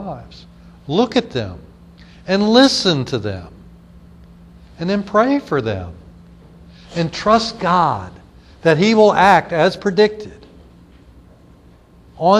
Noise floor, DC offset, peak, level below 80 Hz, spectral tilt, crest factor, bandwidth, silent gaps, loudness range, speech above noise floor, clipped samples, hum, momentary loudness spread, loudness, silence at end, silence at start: -46 dBFS; under 0.1%; 0 dBFS; -46 dBFS; -5.5 dB/octave; 18 dB; 12 kHz; none; 7 LU; 31 dB; under 0.1%; none; 19 LU; -16 LUFS; 0 s; 0 s